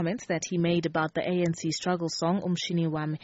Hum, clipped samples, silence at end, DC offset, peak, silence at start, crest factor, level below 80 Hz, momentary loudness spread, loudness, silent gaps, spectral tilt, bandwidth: none; under 0.1%; 0.05 s; under 0.1%; -14 dBFS; 0 s; 14 dB; -64 dBFS; 3 LU; -28 LUFS; none; -5.5 dB/octave; 8 kHz